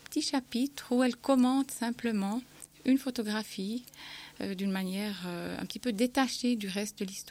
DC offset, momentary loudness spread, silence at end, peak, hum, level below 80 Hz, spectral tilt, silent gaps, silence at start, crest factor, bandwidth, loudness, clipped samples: under 0.1%; 11 LU; 0 s; -14 dBFS; none; -68 dBFS; -4.5 dB/octave; none; 0.1 s; 18 dB; 16.5 kHz; -32 LUFS; under 0.1%